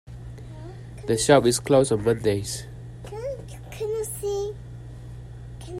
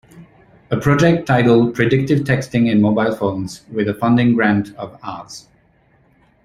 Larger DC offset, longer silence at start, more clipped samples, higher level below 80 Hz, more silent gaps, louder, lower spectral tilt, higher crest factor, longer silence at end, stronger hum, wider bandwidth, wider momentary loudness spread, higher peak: neither; about the same, 0.05 s vs 0.15 s; neither; about the same, -46 dBFS vs -48 dBFS; neither; second, -24 LUFS vs -16 LUFS; second, -5 dB/octave vs -7 dB/octave; first, 24 dB vs 16 dB; second, 0 s vs 1.05 s; neither; first, 16 kHz vs 14 kHz; first, 22 LU vs 16 LU; about the same, -2 dBFS vs 0 dBFS